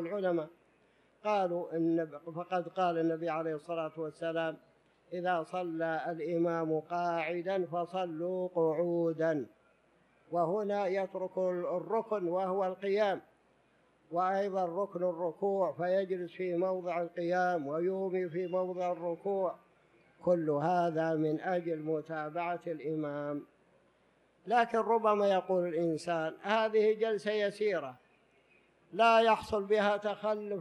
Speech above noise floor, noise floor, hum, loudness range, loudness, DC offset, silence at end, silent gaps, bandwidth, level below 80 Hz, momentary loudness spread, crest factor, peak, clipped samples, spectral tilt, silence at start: 37 dB; -69 dBFS; none; 4 LU; -33 LUFS; under 0.1%; 0 s; none; 11 kHz; -76 dBFS; 8 LU; 20 dB; -12 dBFS; under 0.1%; -6.5 dB/octave; 0 s